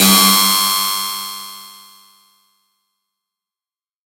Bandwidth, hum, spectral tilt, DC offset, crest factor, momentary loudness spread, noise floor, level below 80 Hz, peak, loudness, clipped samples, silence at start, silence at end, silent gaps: 16.5 kHz; none; -1.5 dB/octave; under 0.1%; 18 dB; 22 LU; under -90 dBFS; -66 dBFS; 0 dBFS; -12 LUFS; under 0.1%; 0 s; 2.45 s; none